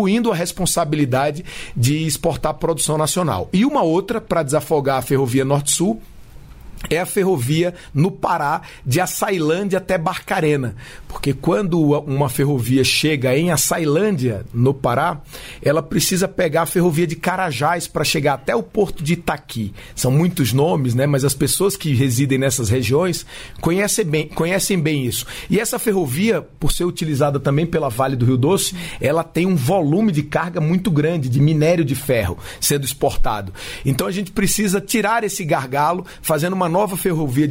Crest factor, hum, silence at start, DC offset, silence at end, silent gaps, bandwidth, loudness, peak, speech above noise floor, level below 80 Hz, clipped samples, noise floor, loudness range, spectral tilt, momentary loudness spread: 14 dB; none; 0 s; under 0.1%; 0 s; none; 16.5 kHz; -18 LUFS; -4 dBFS; 20 dB; -36 dBFS; under 0.1%; -38 dBFS; 2 LU; -5 dB/octave; 6 LU